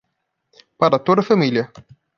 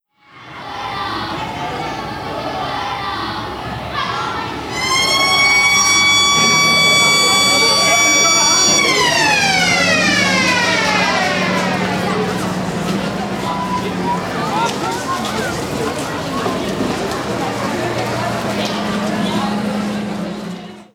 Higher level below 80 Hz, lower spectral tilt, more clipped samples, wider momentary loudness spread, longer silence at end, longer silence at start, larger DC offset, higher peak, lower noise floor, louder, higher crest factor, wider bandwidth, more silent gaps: second, -64 dBFS vs -44 dBFS; first, -7.5 dB/octave vs -2 dB/octave; neither; second, 8 LU vs 13 LU; first, 0.35 s vs 0.1 s; first, 0.8 s vs 0.35 s; neither; about the same, 0 dBFS vs -2 dBFS; first, -74 dBFS vs -41 dBFS; second, -17 LUFS vs -14 LUFS; first, 20 dB vs 14 dB; second, 7 kHz vs 18.5 kHz; neither